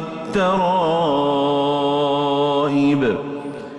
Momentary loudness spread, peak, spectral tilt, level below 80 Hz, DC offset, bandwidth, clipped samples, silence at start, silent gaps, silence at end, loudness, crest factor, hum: 6 LU; -8 dBFS; -6.5 dB/octave; -54 dBFS; under 0.1%; 9.6 kHz; under 0.1%; 0 s; none; 0 s; -19 LUFS; 10 dB; none